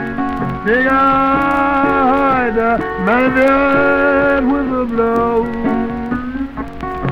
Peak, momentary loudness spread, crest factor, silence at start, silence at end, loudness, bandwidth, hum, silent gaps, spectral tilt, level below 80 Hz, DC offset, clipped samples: -2 dBFS; 9 LU; 12 dB; 0 s; 0 s; -14 LUFS; 7.6 kHz; none; none; -7.5 dB/octave; -36 dBFS; under 0.1%; under 0.1%